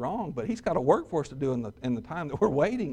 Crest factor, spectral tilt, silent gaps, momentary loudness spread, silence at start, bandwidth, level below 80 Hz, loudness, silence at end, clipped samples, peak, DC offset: 20 dB; -7.5 dB/octave; none; 8 LU; 0 s; 10 kHz; -54 dBFS; -29 LUFS; 0 s; under 0.1%; -8 dBFS; under 0.1%